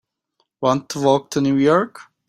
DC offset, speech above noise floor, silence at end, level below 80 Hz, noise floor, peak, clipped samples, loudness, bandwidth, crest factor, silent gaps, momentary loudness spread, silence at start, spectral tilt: under 0.1%; 52 dB; 0.25 s; -60 dBFS; -70 dBFS; -2 dBFS; under 0.1%; -18 LUFS; 15.5 kHz; 18 dB; none; 6 LU; 0.6 s; -6 dB/octave